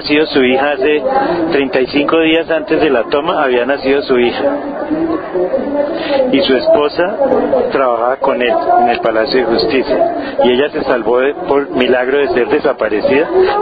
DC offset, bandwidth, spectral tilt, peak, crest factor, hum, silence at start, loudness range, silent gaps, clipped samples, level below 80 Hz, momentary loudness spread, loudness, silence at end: under 0.1%; 5 kHz; -8 dB/octave; 0 dBFS; 12 dB; none; 0 s; 2 LU; none; under 0.1%; -44 dBFS; 5 LU; -13 LUFS; 0 s